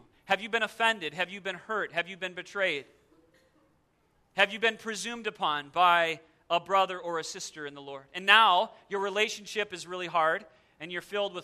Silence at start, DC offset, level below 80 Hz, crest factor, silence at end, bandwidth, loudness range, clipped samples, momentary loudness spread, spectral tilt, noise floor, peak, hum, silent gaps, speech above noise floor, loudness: 0.3 s; under 0.1%; -74 dBFS; 26 dB; 0 s; 14 kHz; 6 LU; under 0.1%; 15 LU; -2 dB/octave; -70 dBFS; -4 dBFS; none; none; 40 dB; -28 LUFS